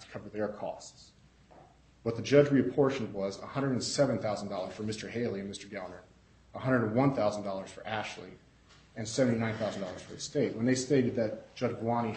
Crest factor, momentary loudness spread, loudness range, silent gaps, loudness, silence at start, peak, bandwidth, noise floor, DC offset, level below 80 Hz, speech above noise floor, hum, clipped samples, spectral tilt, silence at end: 24 dB; 15 LU; 4 LU; none; -32 LUFS; 0 s; -8 dBFS; 8.4 kHz; -60 dBFS; under 0.1%; -64 dBFS; 28 dB; none; under 0.1%; -5.5 dB/octave; 0 s